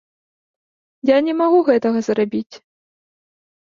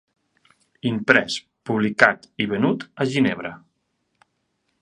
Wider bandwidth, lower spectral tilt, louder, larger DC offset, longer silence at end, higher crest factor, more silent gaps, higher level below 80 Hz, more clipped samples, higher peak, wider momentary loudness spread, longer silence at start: second, 7.4 kHz vs 11 kHz; about the same, -6 dB/octave vs -5.5 dB/octave; first, -17 LUFS vs -21 LUFS; neither; about the same, 1.2 s vs 1.25 s; second, 16 dB vs 24 dB; first, 2.46-2.50 s vs none; about the same, -66 dBFS vs -62 dBFS; neither; second, -4 dBFS vs 0 dBFS; about the same, 10 LU vs 12 LU; first, 1.05 s vs 0.85 s